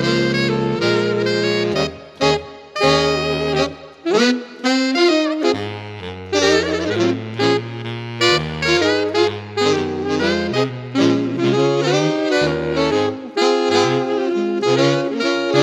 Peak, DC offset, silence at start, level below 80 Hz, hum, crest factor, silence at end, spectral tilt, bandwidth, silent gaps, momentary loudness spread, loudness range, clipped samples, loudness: -2 dBFS; under 0.1%; 0 s; -46 dBFS; none; 16 dB; 0 s; -5 dB/octave; 11.5 kHz; none; 6 LU; 1 LU; under 0.1%; -18 LUFS